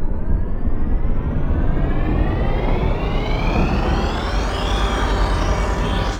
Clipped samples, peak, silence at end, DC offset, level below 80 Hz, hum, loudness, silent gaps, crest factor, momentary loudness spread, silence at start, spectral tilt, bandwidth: under 0.1%; -6 dBFS; 0 s; under 0.1%; -20 dBFS; none; -21 LUFS; none; 12 dB; 4 LU; 0 s; -6.5 dB/octave; 9.2 kHz